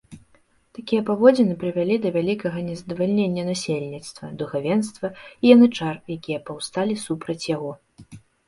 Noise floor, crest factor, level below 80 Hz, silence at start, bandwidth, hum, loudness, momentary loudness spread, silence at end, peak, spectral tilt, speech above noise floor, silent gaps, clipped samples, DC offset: -60 dBFS; 22 dB; -60 dBFS; 0.1 s; 11.5 kHz; none; -22 LUFS; 16 LU; 0.3 s; 0 dBFS; -6 dB/octave; 38 dB; none; under 0.1%; under 0.1%